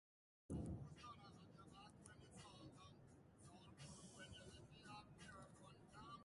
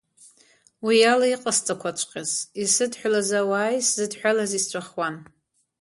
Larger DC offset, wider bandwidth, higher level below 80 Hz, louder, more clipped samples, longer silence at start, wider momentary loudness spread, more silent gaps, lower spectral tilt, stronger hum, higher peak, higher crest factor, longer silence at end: neither; about the same, 11.5 kHz vs 11.5 kHz; about the same, -70 dBFS vs -72 dBFS; second, -60 LUFS vs -23 LUFS; neither; second, 0.5 s vs 0.8 s; about the same, 12 LU vs 10 LU; neither; first, -5 dB/octave vs -2 dB/octave; neither; second, -40 dBFS vs -6 dBFS; about the same, 20 dB vs 18 dB; second, 0 s vs 0.6 s